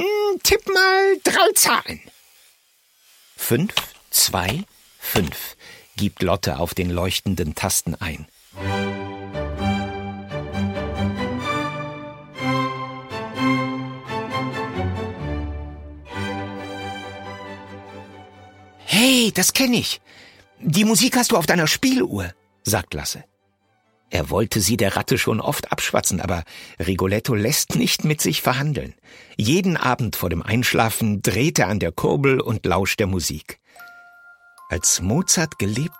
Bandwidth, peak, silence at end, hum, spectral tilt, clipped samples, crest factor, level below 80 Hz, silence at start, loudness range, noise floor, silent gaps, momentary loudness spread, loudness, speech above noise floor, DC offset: 16.5 kHz; 0 dBFS; 0 s; none; -3.5 dB/octave; under 0.1%; 22 dB; -42 dBFS; 0 s; 8 LU; -65 dBFS; none; 17 LU; -20 LUFS; 45 dB; under 0.1%